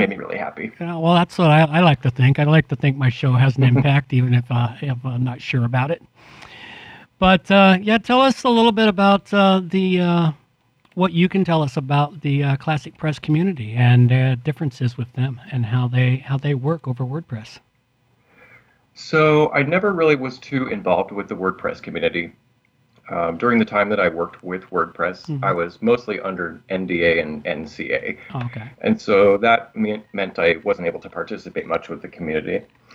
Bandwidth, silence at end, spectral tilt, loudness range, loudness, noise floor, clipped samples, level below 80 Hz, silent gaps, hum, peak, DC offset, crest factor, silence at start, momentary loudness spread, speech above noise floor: 9.2 kHz; 0.35 s; -7.5 dB/octave; 7 LU; -19 LUFS; -62 dBFS; under 0.1%; -52 dBFS; none; none; 0 dBFS; under 0.1%; 18 dB; 0 s; 13 LU; 44 dB